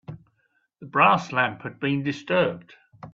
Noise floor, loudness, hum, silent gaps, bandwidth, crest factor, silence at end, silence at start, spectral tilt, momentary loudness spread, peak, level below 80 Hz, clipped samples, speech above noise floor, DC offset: -70 dBFS; -23 LUFS; none; none; 7.8 kHz; 20 dB; 0.05 s; 0.1 s; -6 dB/octave; 11 LU; -4 dBFS; -64 dBFS; under 0.1%; 47 dB; under 0.1%